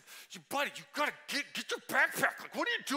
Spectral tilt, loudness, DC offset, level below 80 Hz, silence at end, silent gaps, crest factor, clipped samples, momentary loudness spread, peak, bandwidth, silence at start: -1.5 dB/octave; -34 LUFS; under 0.1%; -86 dBFS; 0 s; none; 22 dB; under 0.1%; 9 LU; -14 dBFS; 16 kHz; 0.05 s